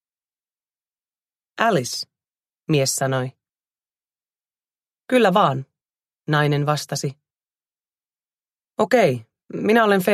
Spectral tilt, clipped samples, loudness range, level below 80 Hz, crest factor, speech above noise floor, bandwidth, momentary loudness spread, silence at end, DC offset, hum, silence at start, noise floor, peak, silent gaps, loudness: -5 dB/octave; under 0.1%; 4 LU; -66 dBFS; 20 dB; over 71 dB; 15 kHz; 17 LU; 0 s; under 0.1%; none; 1.55 s; under -90 dBFS; -2 dBFS; 8.06-8.10 s; -20 LUFS